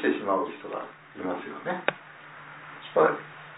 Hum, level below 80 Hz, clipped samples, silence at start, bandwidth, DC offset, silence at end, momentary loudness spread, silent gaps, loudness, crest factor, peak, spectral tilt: none; -76 dBFS; under 0.1%; 0 s; 4 kHz; under 0.1%; 0 s; 20 LU; none; -29 LUFS; 26 dB; -4 dBFS; -9 dB/octave